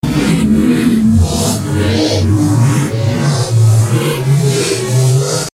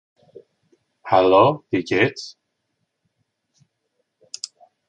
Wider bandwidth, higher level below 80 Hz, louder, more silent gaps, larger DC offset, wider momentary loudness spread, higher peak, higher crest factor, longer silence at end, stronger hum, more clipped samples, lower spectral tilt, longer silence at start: first, 16 kHz vs 11 kHz; first, -32 dBFS vs -60 dBFS; first, -12 LUFS vs -18 LUFS; neither; neither; second, 4 LU vs 23 LU; about the same, 0 dBFS vs -2 dBFS; second, 10 dB vs 22 dB; second, 0.05 s vs 2.6 s; neither; neither; about the same, -6 dB/octave vs -5.5 dB/octave; second, 0.05 s vs 1.05 s